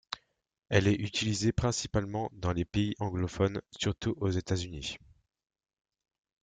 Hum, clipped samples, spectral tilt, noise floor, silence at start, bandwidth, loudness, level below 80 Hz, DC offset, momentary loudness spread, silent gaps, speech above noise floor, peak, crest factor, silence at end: none; under 0.1%; -5 dB/octave; -68 dBFS; 0.1 s; 9.4 kHz; -32 LUFS; -52 dBFS; under 0.1%; 10 LU; none; 37 dB; -8 dBFS; 24 dB; 1.45 s